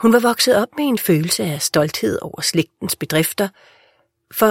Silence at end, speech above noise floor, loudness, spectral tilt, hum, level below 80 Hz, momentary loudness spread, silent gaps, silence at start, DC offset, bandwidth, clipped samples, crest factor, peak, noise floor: 0 s; 41 dB; -18 LUFS; -4 dB/octave; none; -56 dBFS; 9 LU; none; 0 s; under 0.1%; 16.5 kHz; under 0.1%; 18 dB; -2 dBFS; -59 dBFS